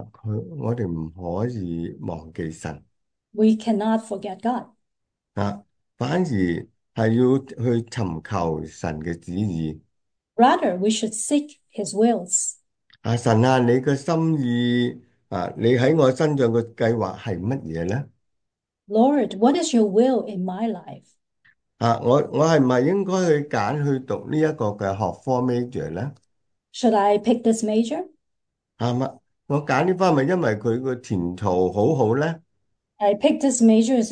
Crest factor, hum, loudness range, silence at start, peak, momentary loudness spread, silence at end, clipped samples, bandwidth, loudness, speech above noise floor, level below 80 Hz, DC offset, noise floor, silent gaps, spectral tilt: 18 dB; none; 5 LU; 0 s; -4 dBFS; 13 LU; 0 s; under 0.1%; 10.5 kHz; -22 LUFS; 59 dB; -56 dBFS; under 0.1%; -80 dBFS; none; -6 dB/octave